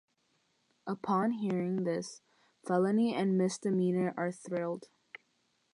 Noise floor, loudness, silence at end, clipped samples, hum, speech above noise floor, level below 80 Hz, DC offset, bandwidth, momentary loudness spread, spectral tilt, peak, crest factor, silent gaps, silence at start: -76 dBFS; -32 LUFS; 0.9 s; under 0.1%; none; 44 dB; -82 dBFS; under 0.1%; 11 kHz; 18 LU; -6.5 dB/octave; -18 dBFS; 16 dB; none; 0.85 s